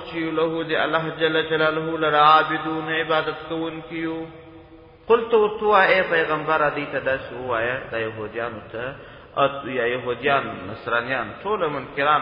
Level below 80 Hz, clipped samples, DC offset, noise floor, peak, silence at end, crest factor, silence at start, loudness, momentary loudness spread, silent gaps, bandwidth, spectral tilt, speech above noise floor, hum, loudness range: -54 dBFS; under 0.1%; under 0.1%; -46 dBFS; -2 dBFS; 0 s; 20 dB; 0 s; -22 LUFS; 13 LU; none; 5.4 kHz; -8 dB/octave; 24 dB; none; 5 LU